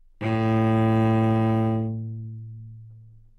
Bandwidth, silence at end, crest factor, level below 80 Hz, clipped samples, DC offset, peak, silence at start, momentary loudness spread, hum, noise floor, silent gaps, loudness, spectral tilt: 4.5 kHz; 0.3 s; 10 dB; -52 dBFS; under 0.1%; under 0.1%; -14 dBFS; 0.2 s; 19 LU; none; -48 dBFS; none; -23 LUFS; -9.5 dB/octave